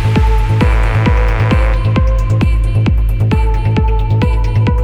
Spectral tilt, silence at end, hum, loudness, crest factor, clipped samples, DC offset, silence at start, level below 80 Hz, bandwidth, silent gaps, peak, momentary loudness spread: -8 dB/octave; 0 s; none; -13 LUFS; 10 dB; under 0.1%; under 0.1%; 0 s; -14 dBFS; 9.2 kHz; none; 0 dBFS; 2 LU